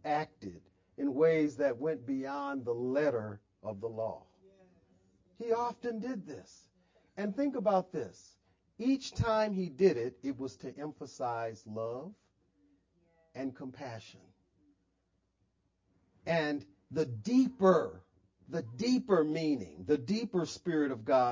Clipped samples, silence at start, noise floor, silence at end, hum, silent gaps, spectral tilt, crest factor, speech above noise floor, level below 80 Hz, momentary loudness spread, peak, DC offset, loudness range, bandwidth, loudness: under 0.1%; 0.05 s; -78 dBFS; 0 s; none; none; -6.5 dB/octave; 22 dB; 45 dB; -64 dBFS; 16 LU; -12 dBFS; under 0.1%; 13 LU; 7.6 kHz; -34 LUFS